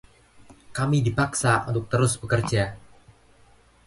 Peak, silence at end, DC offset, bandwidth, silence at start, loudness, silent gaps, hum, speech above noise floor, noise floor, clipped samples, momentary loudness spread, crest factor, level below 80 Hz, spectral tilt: -8 dBFS; 1.1 s; under 0.1%; 11.5 kHz; 0.4 s; -24 LUFS; none; none; 33 dB; -56 dBFS; under 0.1%; 6 LU; 18 dB; -48 dBFS; -5 dB/octave